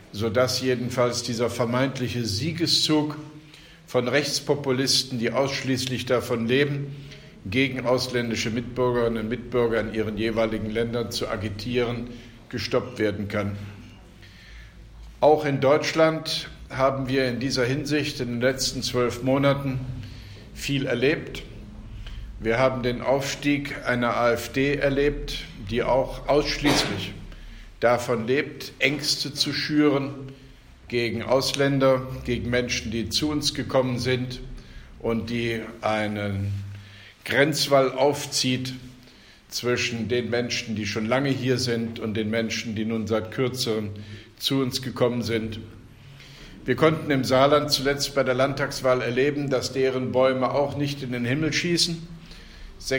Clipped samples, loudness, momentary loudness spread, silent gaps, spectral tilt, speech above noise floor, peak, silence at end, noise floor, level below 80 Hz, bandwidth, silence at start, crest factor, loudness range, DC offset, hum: under 0.1%; -24 LUFS; 15 LU; none; -4.5 dB/octave; 26 dB; -4 dBFS; 0 s; -50 dBFS; -46 dBFS; 16.5 kHz; 0 s; 20 dB; 4 LU; under 0.1%; none